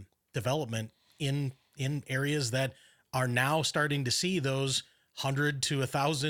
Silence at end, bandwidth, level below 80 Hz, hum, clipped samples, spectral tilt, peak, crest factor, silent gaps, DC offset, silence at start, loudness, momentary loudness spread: 0 s; 17 kHz; -66 dBFS; none; under 0.1%; -4 dB/octave; -12 dBFS; 20 dB; none; under 0.1%; 0 s; -31 LUFS; 9 LU